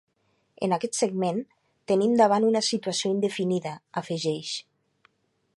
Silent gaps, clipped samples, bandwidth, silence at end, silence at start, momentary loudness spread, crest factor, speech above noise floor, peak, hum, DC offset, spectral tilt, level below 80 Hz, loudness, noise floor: none; under 0.1%; 11.5 kHz; 0.95 s; 0.6 s; 13 LU; 20 dB; 46 dB; -8 dBFS; none; under 0.1%; -4.5 dB/octave; -74 dBFS; -26 LUFS; -71 dBFS